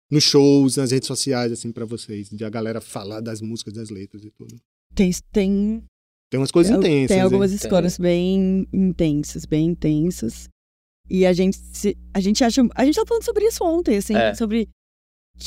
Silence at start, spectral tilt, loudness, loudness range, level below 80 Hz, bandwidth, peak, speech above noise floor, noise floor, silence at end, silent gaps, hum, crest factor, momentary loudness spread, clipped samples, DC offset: 0.1 s; -5.5 dB/octave; -20 LUFS; 8 LU; -42 dBFS; 16 kHz; -4 dBFS; over 71 dB; under -90 dBFS; 0 s; 4.65-4.90 s, 5.88-6.31 s, 10.52-11.04 s, 14.73-15.34 s; none; 16 dB; 14 LU; under 0.1%; under 0.1%